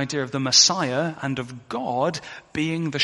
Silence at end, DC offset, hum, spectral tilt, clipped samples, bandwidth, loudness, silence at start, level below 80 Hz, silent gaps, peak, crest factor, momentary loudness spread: 0 s; under 0.1%; none; -2.5 dB/octave; under 0.1%; 11.5 kHz; -21 LUFS; 0 s; -62 dBFS; none; -2 dBFS; 20 dB; 17 LU